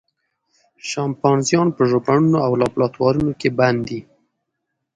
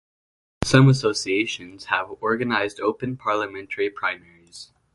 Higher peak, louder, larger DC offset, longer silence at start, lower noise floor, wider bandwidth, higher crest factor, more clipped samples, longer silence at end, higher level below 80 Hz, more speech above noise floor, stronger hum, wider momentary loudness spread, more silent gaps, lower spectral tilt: about the same, -2 dBFS vs -2 dBFS; first, -18 LUFS vs -22 LUFS; neither; first, 0.85 s vs 0.6 s; first, -77 dBFS vs -46 dBFS; about the same, 11 kHz vs 11.5 kHz; about the same, 18 dB vs 22 dB; neither; first, 0.95 s vs 0.3 s; about the same, -52 dBFS vs -52 dBFS; first, 59 dB vs 24 dB; neither; second, 10 LU vs 16 LU; neither; about the same, -6 dB/octave vs -5.5 dB/octave